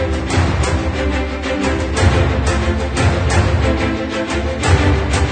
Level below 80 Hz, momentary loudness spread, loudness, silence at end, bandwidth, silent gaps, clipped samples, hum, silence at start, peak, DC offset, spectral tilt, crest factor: -22 dBFS; 5 LU; -16 LUFS; 0 s; 9.4 kHz; none; under 0.1%; none; 0 s; -2 dBFS; under 0.1%; -5.5 dB/octave; 14 dB